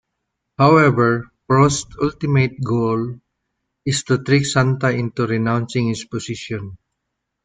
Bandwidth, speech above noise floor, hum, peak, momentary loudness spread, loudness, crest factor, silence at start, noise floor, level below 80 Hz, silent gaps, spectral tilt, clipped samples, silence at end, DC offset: 9.4 kHz; 60 dB; none; -2 dBFS; 13 LU; -18 LUFS; 16 dB; 0.6 s; -77 dBFS; -48 dBFS; none; -6 dB/octave; under 0.1%; 0.7 s; under 0.1%